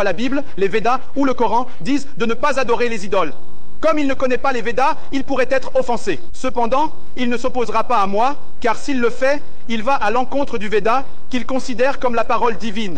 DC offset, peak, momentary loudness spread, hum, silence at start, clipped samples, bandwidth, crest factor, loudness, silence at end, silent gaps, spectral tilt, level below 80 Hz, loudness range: 20%; -4 dBFS; 6 LU; none; 0 s; under 0.1%; 9.8 kHz; 12 dB; -19 LUFS; 0 s; none; -5 dB/octave; -40 dBFS; 1 LU